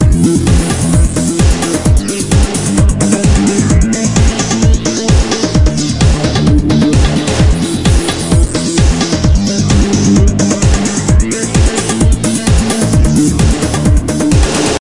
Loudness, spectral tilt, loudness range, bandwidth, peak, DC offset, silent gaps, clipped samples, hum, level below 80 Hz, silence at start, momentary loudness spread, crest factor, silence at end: -11 LUFS; -5 dB/octave; 0 LU; 11.5 kHz; 0 dBFS; 2%; none; under 0.1%; none; -14 dBFS; 0 s; 3 LU; 10 dB; 0 s